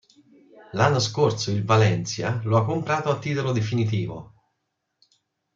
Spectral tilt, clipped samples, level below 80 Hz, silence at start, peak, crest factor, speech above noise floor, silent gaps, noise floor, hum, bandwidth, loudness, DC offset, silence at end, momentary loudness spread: -5.5 dB/octave; under 0.1%; -60 dBFS; 0.55 s; -6 dBFS; 20 dB; 55 dB; none; -78 dBFS; none; 7.6 kHz; -23 LUFS; under 0.1%; 1.3 s; 8 LU